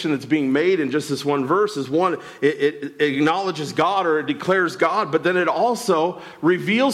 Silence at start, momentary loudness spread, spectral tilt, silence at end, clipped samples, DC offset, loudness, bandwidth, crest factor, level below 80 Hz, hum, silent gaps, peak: 0 s; 4 LU; -5.5 dB/octave; 0 s; under 0.1%; under 0.1%; -20 LUFS; 14.5 kHz; 14 dB; -68 dBFS; none; none; -6 dBFS